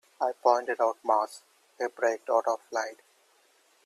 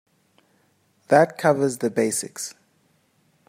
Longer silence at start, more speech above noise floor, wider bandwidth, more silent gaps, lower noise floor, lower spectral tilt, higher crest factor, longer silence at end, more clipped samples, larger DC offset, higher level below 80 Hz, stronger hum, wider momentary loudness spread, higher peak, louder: second, 0.2 s vs 1.1 s; second, 37 dB vs 44 dB; second, 13.5 kHz vs 16 kHz; neither; about the same, -65 dBFS vs -64 dBFS; second, -1.5 dB/octave vs -4.5 dB/octave; about the same, 22 dB vs 22 dB; about the same, 0.9 s vs 0.95 s; neither; neither; second, -88 dBFS vs -70 dBFS; neither; second, 10 LU vs 14 LU; second, -8 dBFS vs -4 dBFS; second, -29 LUFS vs -22 LUFS